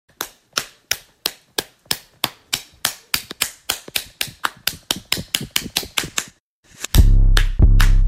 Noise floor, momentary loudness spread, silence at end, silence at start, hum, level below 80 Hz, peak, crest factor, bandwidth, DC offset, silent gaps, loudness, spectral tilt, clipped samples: -52 dBFS; 10 LU; 0 s; 0.2 s; none; -20 dBFS; 0 dBFS; 18 dB; 16.5 kHz; under 0.1%; 6.40-6.63 s; -22 LUFS; -3 dB/octave; under 0.1%